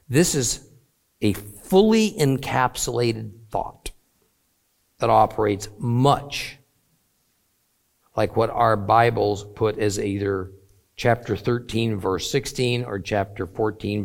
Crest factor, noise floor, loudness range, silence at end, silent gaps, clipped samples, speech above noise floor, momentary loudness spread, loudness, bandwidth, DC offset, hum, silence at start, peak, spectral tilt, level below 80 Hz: 20 dB; -68 dBFS; 3 LU; 0 s; none; under 0.1%; 46 dB; 12 LU; -22 LUFS; 17 kHz; under 0.1%; none; 0.1 s; -2 dBFS; -5 dB/octave; -48 dBFS